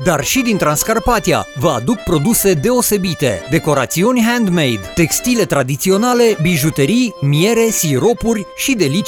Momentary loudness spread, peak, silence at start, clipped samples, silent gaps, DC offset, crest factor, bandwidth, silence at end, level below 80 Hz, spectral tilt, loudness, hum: 4 LU; 0 dBFS; 0 s; under 0.1%; none; under 0.1%; 14 dB; 19 kHz; 0 s; -36 dBFS; -4.5 dB/octave; -14 LUFS; none